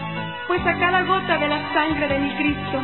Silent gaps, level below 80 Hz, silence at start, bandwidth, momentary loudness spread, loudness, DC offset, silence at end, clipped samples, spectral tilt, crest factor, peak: none; -44 dBFS; 0 s; 4.3 kHz; 5 LU; -21 LUFS; 0.4%; 0 s; under 0.1%; -10 dB/octave; 18 dB; -4 dBFS